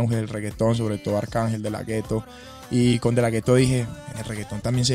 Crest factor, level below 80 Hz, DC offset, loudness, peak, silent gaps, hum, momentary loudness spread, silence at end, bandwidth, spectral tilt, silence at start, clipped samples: 16 dB; -46 dBFS; under 0.1%; -24 LUFS; -6 dBFS; none; none; 12 LU; 0 s; 15.5 kHz; -6 dB/octave; 0 s; under 0.1%